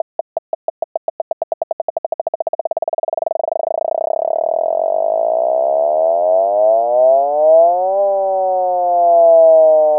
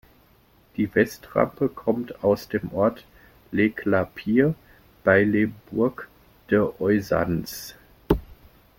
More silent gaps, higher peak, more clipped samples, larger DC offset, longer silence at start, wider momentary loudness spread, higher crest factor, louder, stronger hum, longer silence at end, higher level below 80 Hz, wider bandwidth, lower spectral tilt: first, 0.39-2.71 s vs none; about the same, -2 dBFS vs -4 dBFS; neither; neither; second, 0.35 s vs 0.8 s; about the same, 15 LU vs 13 LU; second, 12 dB vs 20 dB; first, -15 LUFS vs -24 LUFS; neither; second, 0 s vs 0.45 s; second, -68 dBFS vs -46 dBFS; second, 1.4 kHz vs 17 kHz; first, -11 dB/octave vs -7 dB/octave